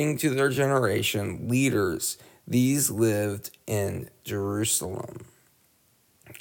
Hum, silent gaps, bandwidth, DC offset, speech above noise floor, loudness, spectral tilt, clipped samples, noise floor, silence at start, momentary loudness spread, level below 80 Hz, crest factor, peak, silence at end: none; none; 19.5 kHz; under 0.1%; 39 dB; -26 LUFS; -4.5 dB/octave; under 0.1%; -65 dBFS; 0 s; 13 LU; -60 dBFS; 16 dB; -10 dBFS; 0.05 s